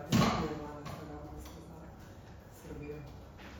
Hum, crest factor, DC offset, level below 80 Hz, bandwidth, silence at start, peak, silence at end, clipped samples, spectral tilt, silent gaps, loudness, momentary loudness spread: none; 22 dB; under 0.1%; -52 dBFS; 19.5 kHz; 0 s; -16 dBFS; 0 s; under 0.1%; -5.5 dB/octave; none; -38 LUFS; 21 LU